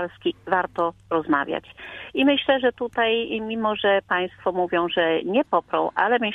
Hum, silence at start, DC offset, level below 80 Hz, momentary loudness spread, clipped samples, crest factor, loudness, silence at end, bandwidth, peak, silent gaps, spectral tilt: none; 0 s; under 0.1%; -60 dBFS; 8 LU; under 0.1%; 18 dB; -23 LUFS; 0 s; 4.9 kHz; -4 dBFS; none; -6.5 dB/octave